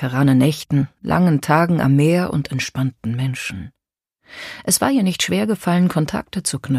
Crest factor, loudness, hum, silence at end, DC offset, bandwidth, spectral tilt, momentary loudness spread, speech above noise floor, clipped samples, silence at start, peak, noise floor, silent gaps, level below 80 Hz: 18 dB; -18 LUFS; none; 0 s; under 0.1%; 15 kHz; -5.5 dB/octave; 9 LU; 57 dB; under 0.1%; 0 s; 0 dBFS; -74 dBFS; none; -48 dBFS